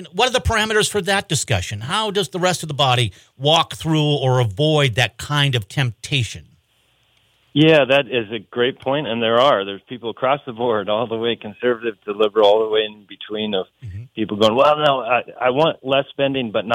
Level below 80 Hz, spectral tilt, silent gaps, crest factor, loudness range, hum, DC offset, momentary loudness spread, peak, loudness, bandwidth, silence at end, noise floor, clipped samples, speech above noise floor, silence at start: -46 dBFS; -4.5 dB/octave; none; 16 dB; 2 LU; none; under 0.1%; 11 LU; -2 dBFS; -18 LUFS; 16.5 kHz; 0 s; -61 dBFS; under 0.1%; 43 dB; 0 s